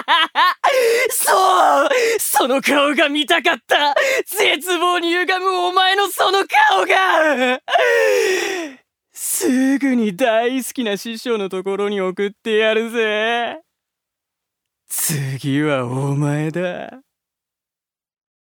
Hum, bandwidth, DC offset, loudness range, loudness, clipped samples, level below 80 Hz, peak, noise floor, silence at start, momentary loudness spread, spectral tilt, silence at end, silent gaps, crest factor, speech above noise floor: none; over 20 kHz; under 0.1%; 7 LU; -16 LUFS; under 0.1%; -72 dBFS; 0 dBFS; -89 dBFS; 0 s; 9 LU; -3.5 dB/octave; 1.6 s; none; 16 dB; 72 dB